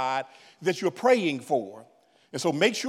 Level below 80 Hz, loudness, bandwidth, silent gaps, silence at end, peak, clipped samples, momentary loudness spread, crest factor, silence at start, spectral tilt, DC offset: -88 dBFS; -26 LUFS; 15 kHz; none; 0 s; -8 dBFS; under 0.1%; 15 LU; 20 dB; 0 s; -4 dB/octave; under 0.1%